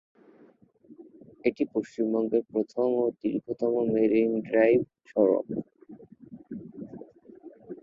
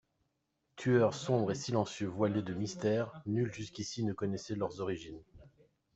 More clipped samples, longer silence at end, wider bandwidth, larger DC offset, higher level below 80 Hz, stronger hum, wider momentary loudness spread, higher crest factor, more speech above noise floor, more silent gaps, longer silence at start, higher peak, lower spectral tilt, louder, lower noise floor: neither; second, 0.1 s vs 0.45 s; second, 7.4 kHz vs 8.2 kHz; neither; about the same, -68 dBFS vs -68 dBFS; neither; first, 19 LU vs 10 LU; about the same, 20 dB vs 20 dB; second, 33 dB vs 47 dB; neither; first, 0.9 s vs 0.75 s; first, -8 dBFS vs -16 dBFS; first, -8.5 dB/octave vs -6 dB/octave; first, -27 LUFS vs -35 LUFS; second, -58 dBFS vs -81 dBFS